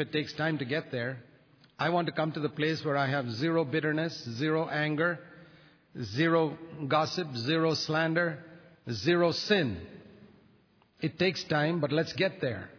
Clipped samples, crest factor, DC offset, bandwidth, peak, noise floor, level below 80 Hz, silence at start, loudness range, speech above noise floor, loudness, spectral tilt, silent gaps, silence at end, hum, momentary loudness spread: under 0.1%; 18 dB; under 0.1%; 5.4 kHz; -14 dBFS; -64 dBFS; -68 dBFS; 0 s; 2 LU; 35 dB; -30 LUFS; -6 dB/octave; none; 0 s; none; 11 LU